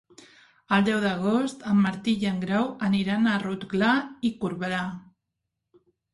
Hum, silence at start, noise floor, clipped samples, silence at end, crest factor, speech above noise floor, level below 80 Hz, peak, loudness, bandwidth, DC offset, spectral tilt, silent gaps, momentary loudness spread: none; 0.7 s; -82 dBFS; under 0.1%; 1.15 s; 16 dB; 58 dB; -62 dBFS; -10 dBFS; -25 LUFS; 11.5 kHz; under 0.1%; -6.5 dB/octave; none; 7 LU